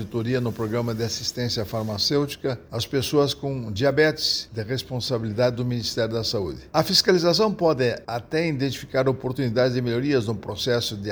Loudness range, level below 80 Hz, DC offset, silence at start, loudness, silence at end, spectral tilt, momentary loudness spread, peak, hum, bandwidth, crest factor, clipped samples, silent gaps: 3 LU; -52 dBFS; under 0.1%; 0 s; -24 LUFS; 0 s; -5 dB/octave; 9 LU; -4 dBFS; none; over 20 kHz; 20 dB; under 0.1%; none